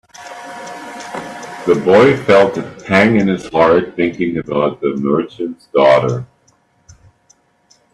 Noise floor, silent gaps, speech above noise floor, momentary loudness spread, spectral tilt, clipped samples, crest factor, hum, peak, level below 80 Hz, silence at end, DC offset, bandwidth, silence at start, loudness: -56 dBFS; none; 43 dB; 19 LU; -6.5 dB/octave; under 0.1%; 16 dB; none; 0 dBFS; -52 dBFS; 1.7 s; under 0.1%; 12 kHz; 0.2 s; -14 LUFS